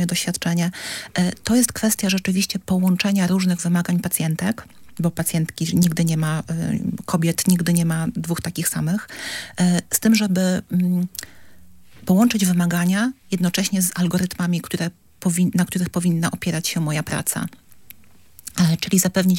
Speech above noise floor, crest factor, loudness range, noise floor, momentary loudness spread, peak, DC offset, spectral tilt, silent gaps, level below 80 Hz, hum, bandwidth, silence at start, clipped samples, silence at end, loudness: 32 dB; 20 dB; 2 LU; -52 dBFS; 8 LU; -2 dBFS; under 0.1%; -5 dB/octave; none; -54 dBFS; none; 17 kHz; 0 s; under 0.1%; 0 s; -21 LUFS